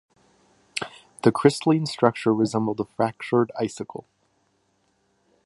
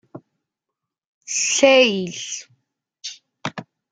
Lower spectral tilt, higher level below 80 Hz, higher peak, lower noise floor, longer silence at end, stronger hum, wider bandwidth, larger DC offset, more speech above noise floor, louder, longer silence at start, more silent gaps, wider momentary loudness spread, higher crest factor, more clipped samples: first, -6 dB/octave vs -2 dB/octave; first, -66 dBFS vs -72 dBFS; about the same, -2 dBFS vs -2 dBFS; second, -68 dBFS vs -84 dBFS; first, 1.45 s vs 0.3 s; neither; first, 11.5 kHz vs 9.6 kHz; neither; second, 46 dB vs 66 dB; second, -23 LUFS vs -17 LUFS; first, 0.75 s vs 0.15 s; second, none vs 1.06-1.21 s; second, 16 LU vs 21 LU; about the same, 24 dB vs 22 dB; neither